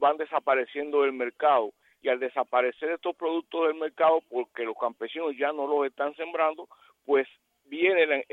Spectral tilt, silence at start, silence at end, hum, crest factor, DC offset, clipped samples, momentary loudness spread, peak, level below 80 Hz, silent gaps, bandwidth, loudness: -5.5 dB/octave; 0 s; 0.1 s; none; 18 dB; under 0.1%; under 0.1%; 9 LU; -8 dBFS; -86 dBFS; none; 4.2 kHz; -27 LUFS